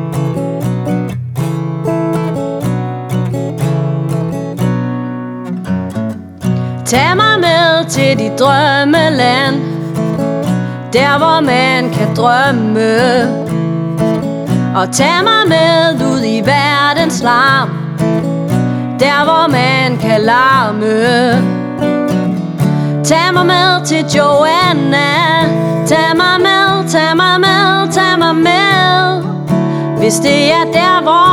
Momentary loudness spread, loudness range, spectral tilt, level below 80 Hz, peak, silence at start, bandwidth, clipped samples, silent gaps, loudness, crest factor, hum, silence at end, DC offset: 9 LU; 7 LU; -5 dB/octave; -46 dBFS; 0 dBFS; 0 s; 18 kHz; under 0.1%; none; -11 LUFS; 12 dB; none; 0 s; under 0.1%